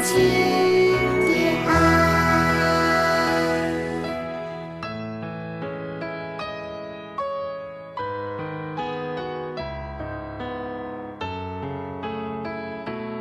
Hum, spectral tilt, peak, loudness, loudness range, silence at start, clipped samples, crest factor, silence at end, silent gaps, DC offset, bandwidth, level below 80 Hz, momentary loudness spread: none; -5 dB/octave; -6 dBFS; -24 LUFS; 13 LU; 0 s; under 0.1%; 16 dB; 0 s; none; under 0.1%; 14 kHz; -46 dBFS; 15 LU